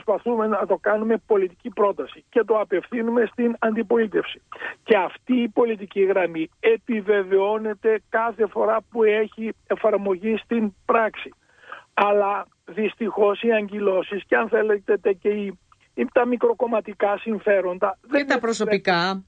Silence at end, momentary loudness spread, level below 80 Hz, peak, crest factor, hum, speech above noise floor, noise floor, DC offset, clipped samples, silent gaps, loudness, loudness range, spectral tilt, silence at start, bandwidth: 0.05 s; 8 LU; -64 dBFS; -4 dBFS; 18 dB; none; 22 dB; -44 dBFS; under 0.1%; under 0.1%; none; -22 LUFS; 2 LU; -6 dB/octave; 0.05 s; 9 kHz